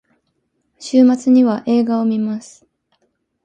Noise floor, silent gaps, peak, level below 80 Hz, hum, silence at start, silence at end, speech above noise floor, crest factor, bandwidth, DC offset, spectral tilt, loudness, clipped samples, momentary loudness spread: -68 dBFS; none; -2 dBFS; -66 dBFS; none; 0.8 s; 1.05 s; 54 dB; 16 dB; 9.2 kHz; under 0.1%; -6.5 dB/octave; -15 LUFS; under 0.1%; 12 LU